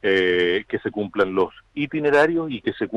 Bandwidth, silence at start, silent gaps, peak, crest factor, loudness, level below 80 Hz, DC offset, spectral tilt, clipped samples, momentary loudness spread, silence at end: 10 kHz; 0.05 s; none; -8 dBFS; 12 dB; -21 LUFS; -56 dBFS; under 0.1%; -6 dB/octave; under 0.1%; 9 LU; 0 s